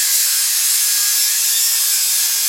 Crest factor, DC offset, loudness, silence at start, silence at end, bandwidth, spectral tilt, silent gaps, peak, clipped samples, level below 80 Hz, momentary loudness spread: 14 dB; under 0.1%; -13 LUFS; 0 s; 0 s; 16.5 kHz; 6.5 dB/octave; none; -2 dBFS; under 0.1%; -82 dBFS; 1 LU